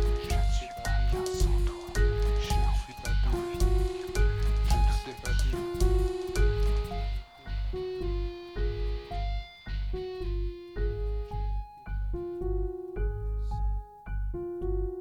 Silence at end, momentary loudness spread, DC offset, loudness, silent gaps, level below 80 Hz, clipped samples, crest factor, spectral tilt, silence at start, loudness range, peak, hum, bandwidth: 0 s; 9 LU; under 0.1%; -32 LUFS; none; -30 dBFS; under 0.1%; 16 dB; -6 dB/octave; 0 s; 6 LU; -12 dBFS; none; 13 kHz